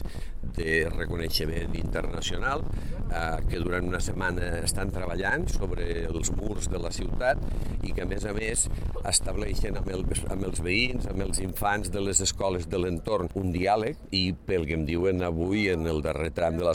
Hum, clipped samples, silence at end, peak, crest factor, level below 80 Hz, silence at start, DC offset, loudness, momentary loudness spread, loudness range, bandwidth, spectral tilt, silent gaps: none; under 0.1%; 0 s; -6 dBFS; 22 dB; -34 dBFS; 0 s; under 0.1%; -29 LUFS; 7 LU; 3 LU; 16 kHz; -4 dB/octave; none